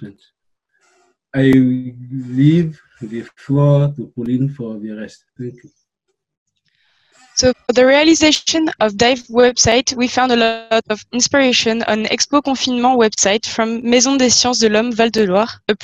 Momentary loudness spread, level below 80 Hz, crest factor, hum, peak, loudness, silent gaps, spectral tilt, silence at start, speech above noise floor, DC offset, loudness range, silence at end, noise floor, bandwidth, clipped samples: 16 LU; -48 dBFS; 14 dB; none; -2 dBFS; -14 LUFS; 6.37-6.46 s; -4 dB/octave; 0 s; 59 dB; under 0.1%; 7 LU; 0 s; -73 dBFS; 8.8 kHz; under 0.1%